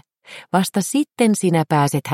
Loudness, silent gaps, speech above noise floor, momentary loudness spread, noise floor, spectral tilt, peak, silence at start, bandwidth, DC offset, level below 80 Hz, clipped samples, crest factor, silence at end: -19 LUFS; none; 25 dB; 5 LU; -42 dBFS; -5.5 dB/octave; -2 dBFS; 0.3 s; 16.5 kHz; under 0.1%; -64 dBFS; under 0.1%; 16 dB; 0 s